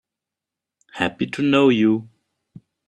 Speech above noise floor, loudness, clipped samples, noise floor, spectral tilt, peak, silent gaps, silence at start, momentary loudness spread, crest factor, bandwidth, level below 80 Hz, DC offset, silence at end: 68 dB; -19 LUFS; under 0.1%; -86 dBFS; -6.5 dB/octave; -2 dBFS; none; 0.95 s; 10 LU; 20 dB; 10 kHz; -62 dBFS; under 0.1%; 0.8 s